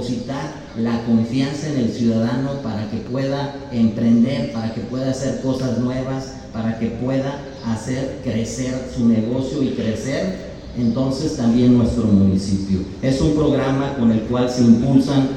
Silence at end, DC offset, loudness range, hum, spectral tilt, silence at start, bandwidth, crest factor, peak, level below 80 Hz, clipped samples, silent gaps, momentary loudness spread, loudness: 0 s; under 0.1%; 6 LU; none; -7 dB/octave; 0 s; 9.2 kHz; 18 dB; 0 dBFS; -40 dBFS; under 0.1%; none; 10 LU; -20 LUFS